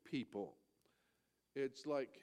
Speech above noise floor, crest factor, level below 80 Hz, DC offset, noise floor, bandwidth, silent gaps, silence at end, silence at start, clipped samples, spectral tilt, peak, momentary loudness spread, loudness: 39 dB; 18 dB; -90 dBFS; under 0.1%; -83 dBFS; 12.5 kHz; none; 0 s; 0.05 s; under 0.1%; -6 dB/octave; -30 dBFS; 9 LU; -46 LUFS